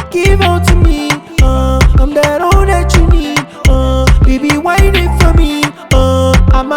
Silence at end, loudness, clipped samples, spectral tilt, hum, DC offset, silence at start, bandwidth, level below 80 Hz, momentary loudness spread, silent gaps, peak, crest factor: 0 s; -10 LUFS; 0.3%; -5.5 dB/octave; none; under 0.1%; 0 s; 16.5 kHz; -12 dBFS; 3 LU; none; 0 dBFS; 8 dB